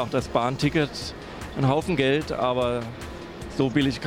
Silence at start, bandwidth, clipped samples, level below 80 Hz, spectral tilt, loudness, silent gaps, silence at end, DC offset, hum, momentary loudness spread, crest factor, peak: 0 s; 16 kHz; under 0.1%; -44 dBFS; -6 dB/octave; -25 LUFS; none; 0 s; under 0.1%; none; 14 LU; 18 dB; -8 dBFS